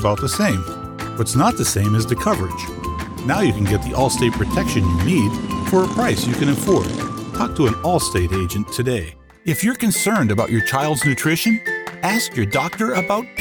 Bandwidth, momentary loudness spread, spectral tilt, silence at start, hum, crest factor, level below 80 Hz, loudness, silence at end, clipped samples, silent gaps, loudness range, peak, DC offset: over 20 kHz; 8 LU; -5 dB/octave; 0 s; none; 14 dB; -36 dBFS; -19 LUFS; 0 s; under 0.1%; none; 2 LU; -4 dBFS; under 0.1%